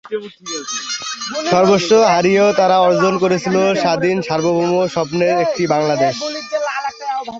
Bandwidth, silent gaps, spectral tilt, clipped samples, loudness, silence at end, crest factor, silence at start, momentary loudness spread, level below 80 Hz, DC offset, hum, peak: 8 kHz; none; -4.5 dB/octave; under 0.1%; -15 LUFS; 0 s; 14 dB; 0.05 s; 11 LU; -56 dBFS; under 0.1%; none; 0 dBFS